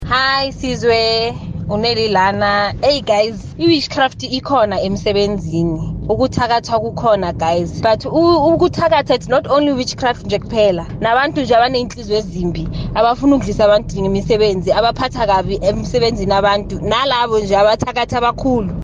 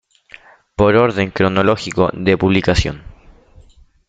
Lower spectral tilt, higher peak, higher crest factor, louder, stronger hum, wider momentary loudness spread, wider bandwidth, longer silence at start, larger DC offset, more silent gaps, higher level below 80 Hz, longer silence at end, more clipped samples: about the same, -5.5 dB/octave vs -6 dB/octave; about the same, -2 dBFS vs 0 dBFS; about the same, 12 dB vs 16 dB; about the same, -15 LUFS vs -15 LUFS; neither; second, 6 LU vs 9 LU; about the same, 9.6 kHz vs 9 kHz; second, 0 s vs 0.8 s; neither; neither; about the same, -34 dBFS vs -34 dBFS; second, 0 s vs 0.95 s; neither